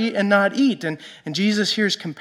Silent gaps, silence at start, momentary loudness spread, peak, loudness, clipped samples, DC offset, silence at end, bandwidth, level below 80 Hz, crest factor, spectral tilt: none; 0 s; 11 LU; -4 dBFS; -20 LUFS; under 0.1%; under 0.1%; 0 s; 13 kHz; -74 dBFS; 16 dB; -4.5 dB/octave